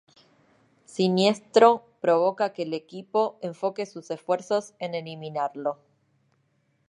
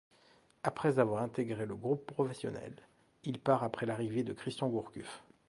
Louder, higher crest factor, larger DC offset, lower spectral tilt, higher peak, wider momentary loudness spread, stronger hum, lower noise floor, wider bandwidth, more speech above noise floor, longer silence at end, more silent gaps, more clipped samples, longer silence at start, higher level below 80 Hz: first, -25 LUFS vs -36 LUFS; about the same, 22 dB vs 22 dB; neither; second, -5.5 dB/octave vs -7 dB/octave; first, -4 dBFS vs -14 dBFS; about the same, 15 LU vs 14 LU; neither; about the same, -69 dBFS vs -66 dBFS; about the same, 11 kHz vs 11.5 kHz; first, 45 dB vs 31 dB; first, 1.15 s vs 0.25 s; neither; neither; first, 0.95 s vs 0.65 s; second, -80 dBFS vs -72 dBFS